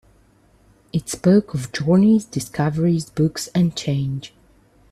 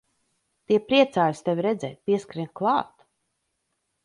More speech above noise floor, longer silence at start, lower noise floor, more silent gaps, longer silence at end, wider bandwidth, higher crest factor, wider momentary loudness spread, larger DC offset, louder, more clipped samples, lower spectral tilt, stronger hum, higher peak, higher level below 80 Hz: second, 36 dB vs 53 dB; first, 0.95 s vs 0.7 s; second, -55 dBFS vs -77 dBFS; neither; second, 0.65 s vs 1.2 s; first, 13.5 kHz vs 11 kHz; about the same, 16 dB vs 20 dB; about the same, 11 LU vs 9 LU; neither; first, -20 LUFS vs -24 LUFS; neither; about the same, -6.5 dB/octave vs -6 dB/octave; neither; about the same, -6 dBFS vs -6 dBFS; first, -52 dBFS vs -68 dBFS